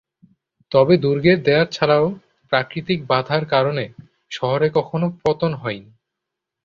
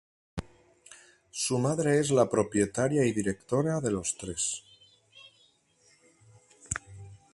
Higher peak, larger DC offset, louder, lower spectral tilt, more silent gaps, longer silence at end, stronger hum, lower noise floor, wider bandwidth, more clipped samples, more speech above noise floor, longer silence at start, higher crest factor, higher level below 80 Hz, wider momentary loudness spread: first, -2 dBFS vs -10 dBFS; neither; first, -19 LUFS vs -29 LUFS; first, -7 dB/octave vs -5 dB/octave; neither; first, 0.85 s vs 0.2 s; neither; first, -82 dBFS vs -65 dBFS; second, 7.4 kHz vs 11.5 kHz; neither; first, 64 dB vs 38 dB; first, 0.7 s vs 0.35 s; about the same, 18 dB vs 22 dB; about the same, -56 dBFS vs -56 dBFS; second, 12 LU vs 17 LU